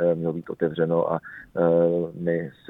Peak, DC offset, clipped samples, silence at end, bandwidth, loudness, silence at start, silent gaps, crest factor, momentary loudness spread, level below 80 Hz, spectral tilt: -8 dBFS; under 0.1%; under 0.1%; 0.2 s; 4 kHz; -24 LUFS; 0 s; none; 16 dB; 9 LU; -60 dBFS; -10.5 dB/octave